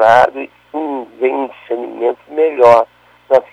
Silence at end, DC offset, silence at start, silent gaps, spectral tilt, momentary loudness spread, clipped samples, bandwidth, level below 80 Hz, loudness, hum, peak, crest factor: 0.1 s; under 0.1%; 0 s; none; -5.5 dB/octave; 14 LU; 0.2%; 10.5 kHz; -54 dBFS; -14 LUFS; 60 Hz at -55 dBFS; 0 dBFS; 14 dB